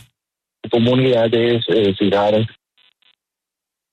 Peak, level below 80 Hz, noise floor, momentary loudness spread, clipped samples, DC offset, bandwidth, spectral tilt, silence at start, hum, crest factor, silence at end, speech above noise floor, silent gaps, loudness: -4 dBFS; -58 dBFS; -85 dBFS; 7 LU; under 0.1%; under 0.1%; 8.6 kHz; -8 dB/octave; 0.65 s; none; 14 dB; 1.45 s; 69 dB; none; -16 LUFS